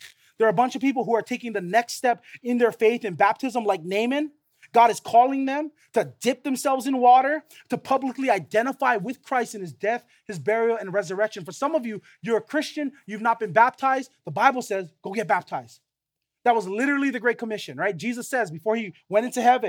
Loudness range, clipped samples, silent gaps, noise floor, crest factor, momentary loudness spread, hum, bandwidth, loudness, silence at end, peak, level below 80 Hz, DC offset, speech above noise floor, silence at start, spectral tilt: 4 LU; under 0.1%; none; -84 dBFS; 22 dB; 11 LU; none; 18 kHz; -24 LUFS; 0 s; -2 dBFS; -82 dBFS; under 0.1%; 61 dB; 0 s; -4.5 dB/octave